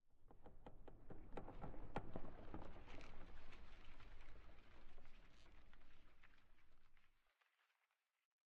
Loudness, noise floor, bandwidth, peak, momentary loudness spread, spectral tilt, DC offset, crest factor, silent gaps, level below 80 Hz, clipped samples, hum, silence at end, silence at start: -61 LUFS; under -90 dBFS; 5.8 kHz; -32 dBFS; 14 LU; -5.5 dB/octave; under 0.1%; 20 dB; none; -60 dBFS; under 0.1%; none; 1.5 s; 0.05 s